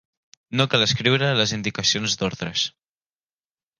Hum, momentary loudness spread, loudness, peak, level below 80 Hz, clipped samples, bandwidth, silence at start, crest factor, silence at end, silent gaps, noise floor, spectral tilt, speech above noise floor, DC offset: none; 6 LU; -21 LUFS; -4 dBFS; -54 dBFS; under 0.1%; 11 kHz; 0.5 s; 20 dB; 1.1 s; none; under -90 dBFS; -3.5 dB/octave; over 68 dB; under 0.1%